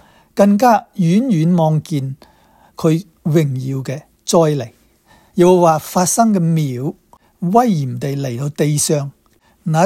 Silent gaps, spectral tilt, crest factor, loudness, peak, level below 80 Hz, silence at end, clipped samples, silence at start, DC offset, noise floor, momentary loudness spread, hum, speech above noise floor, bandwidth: none; -6 dB/octave; 16 dB; -16 LUFS; 0 dBFS; -56 dBFS; 0 s; under 0.1%; 0.35 s; under 0.1%; -54 dBFS; 14 LU; none; 39 dB; 16 kHz